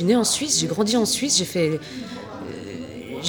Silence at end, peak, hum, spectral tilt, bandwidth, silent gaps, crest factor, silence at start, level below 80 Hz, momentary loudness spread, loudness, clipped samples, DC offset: 0 s; -6 dBFS; none; -3 dB/octave; over 20 kHz; none; 16 dB; 0 s; -60 dBFS; 16 LU; -20 LUFS; under 0.1%; under 0.1%